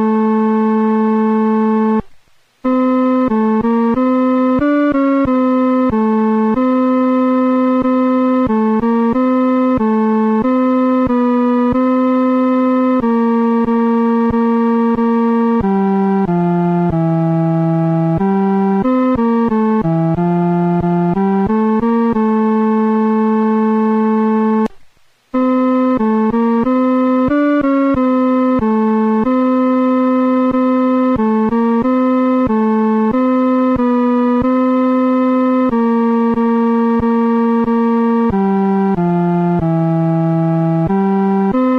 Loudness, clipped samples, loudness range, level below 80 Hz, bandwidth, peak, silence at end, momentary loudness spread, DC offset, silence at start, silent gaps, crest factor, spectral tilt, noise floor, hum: -14 LUFS; under 0.1%; 1 LU; -42 dBFS; 5.2 kHz; -6 dBFS; 0 s; 1 LU; under 0.1%; 0 s; none; 8 dB; -10 dB/octave; -47 dBFS; none